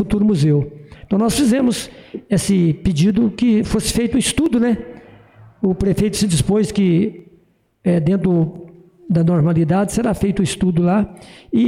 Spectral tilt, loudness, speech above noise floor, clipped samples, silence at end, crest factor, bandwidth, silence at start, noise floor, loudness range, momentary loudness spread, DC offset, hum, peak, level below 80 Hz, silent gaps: -6 dB/octave; -17 LUFS; 40 dB; under 0.1%; 0 s; 10 dB; 16 kHz; 0 s; -56 dBFS; 1 LU; 8 LU; under 0.1%; none; -8 dBFS; -38 dBFS; none